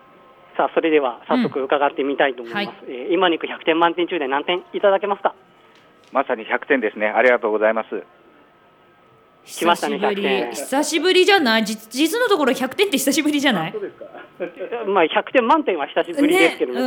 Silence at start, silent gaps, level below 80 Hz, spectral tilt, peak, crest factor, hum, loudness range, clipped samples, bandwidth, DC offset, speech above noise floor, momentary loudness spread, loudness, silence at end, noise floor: 0.55 s; none; -72 dBFS; -3.5 dB/octave; -2 dBFS; 18 dB; none; 4 LU; under 0.1%; 19.5 kHz; under 0.1%; 33 dB; 12 LU; -19 LUFS; 0 s; -53 dBFS